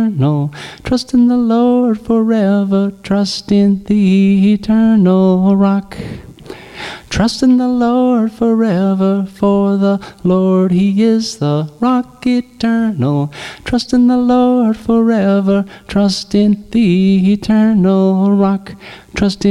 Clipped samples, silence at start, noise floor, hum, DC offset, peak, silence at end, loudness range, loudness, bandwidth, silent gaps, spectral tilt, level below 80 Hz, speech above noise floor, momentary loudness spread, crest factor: under 0.1%; 0 s; -32 dBFS; none; under 0.1%; -2 dBFS; 0 s; 3 LU; -13 LUFS; 11 kHz; none; -7 dB/octave; -40 dBFS; 20 dB; 8 LU; 10 dB